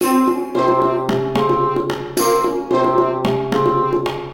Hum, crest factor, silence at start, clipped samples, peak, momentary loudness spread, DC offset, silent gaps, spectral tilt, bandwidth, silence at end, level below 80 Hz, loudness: none; 14 dB; 0 s; under 0.1%; -2 dBFS; 4 LU; 0.1%; none; -5.5 dB/octave; 17 kHz; 0 s; -46 dBFS; -17 LUFS